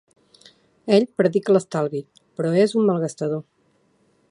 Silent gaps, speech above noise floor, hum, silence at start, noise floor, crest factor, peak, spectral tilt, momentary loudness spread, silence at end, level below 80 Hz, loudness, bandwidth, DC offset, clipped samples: none; 43 dB; none; 0.85 s; -63 dBFS; 20 dB; -4 dBFS; -6.5 dB/octave; 13 LU; 0.9 s; -72 dBFS; -21 LUFS; 11 kHz; under 0.1%; under 0.1%